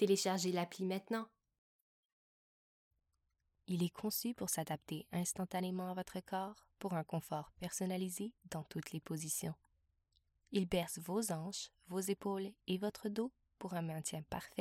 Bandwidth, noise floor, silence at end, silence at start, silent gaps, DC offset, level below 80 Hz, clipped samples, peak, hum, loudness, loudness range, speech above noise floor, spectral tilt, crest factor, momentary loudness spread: 17.5 kHz; -84 dBFS; 0 s; 0 s; 1.58-2.91 s; under 0.1%; -70 dBFS; under 0.1%; -20 dBFS; none; -41 LUFS; 4 LU; 44 dB; -4.5 dB/octave; 20 dB; 8 LU